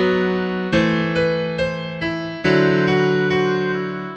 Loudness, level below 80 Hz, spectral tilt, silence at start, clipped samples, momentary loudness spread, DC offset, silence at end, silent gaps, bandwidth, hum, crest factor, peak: -19 LUFS; -46 dBFS; -7 dB/octave; 0 s; under 0.1%; 8 LU; under 0.1%; 0 s; none; 8.4 kHz; none; 16 dB; -4 dBFS